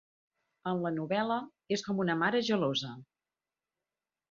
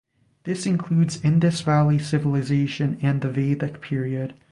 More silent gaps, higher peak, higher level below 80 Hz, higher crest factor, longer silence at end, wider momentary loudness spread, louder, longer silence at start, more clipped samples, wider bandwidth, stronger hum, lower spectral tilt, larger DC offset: neither; second, -14 dBFS vs -6 dBFS; second, -74 dBFS vs -54 dBFS; about the same, 20 dB vs 16 dB; first, 1.3 s vs 0.2 s; about the same, 10 LU vs 8 LU; second, -32 LUFS vs -23 LUFS; first, 0.65 s vs 0.45 s; neither; second, 7.6 kHz vs 11 kHz; neither; second, -5.5 dB/octave vs -7 dB/octave; neither